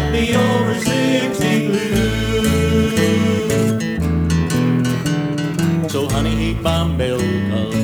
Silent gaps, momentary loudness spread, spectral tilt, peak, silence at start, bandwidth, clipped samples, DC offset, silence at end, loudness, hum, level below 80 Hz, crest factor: none; 4 LU; -5.5 dB/octave; -4 dBFS; 0 s; over 20 kHz; under 0.1%; under 0.1%; 0 s; -17 LUFS; none; -30 dBFS; 14 dB